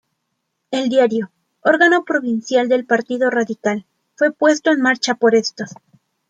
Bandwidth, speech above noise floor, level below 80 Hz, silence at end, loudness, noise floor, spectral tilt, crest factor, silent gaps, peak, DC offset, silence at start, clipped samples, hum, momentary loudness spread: 9.2 kHz; 57 dB; -70 dBFS; 0.6 s; -17 LUFS; -73 dBFS; -4 dB/octave; 16 dB; none; -2 dBFS; under 0.1%; 0.7 s; under 0.1%; none; 12 LU